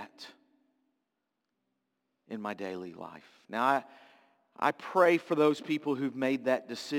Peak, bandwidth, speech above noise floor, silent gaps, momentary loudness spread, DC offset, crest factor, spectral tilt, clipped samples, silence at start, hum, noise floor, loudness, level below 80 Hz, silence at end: -10 dBFS; 17 kHz; 54 dB; none; 21 LU; under 0.1%; 22 dB; -5.5 dB/octave; under 0.1%; 0 s; none; -84 dBFS; -30 LUFS; -86 dBFS; 0 s